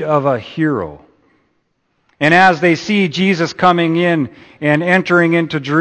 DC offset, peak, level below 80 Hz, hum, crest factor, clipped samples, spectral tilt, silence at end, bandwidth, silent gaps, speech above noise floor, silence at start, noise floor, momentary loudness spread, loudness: under 0.1%; 0 dBFS; -54 dBFS; none; 14 dB; under 0.1%; -6 dB/octave; 0 s; 8.8 kHz; none; 51 dB; 0 s; -64 dBFS; 9 LU; -14 LUFS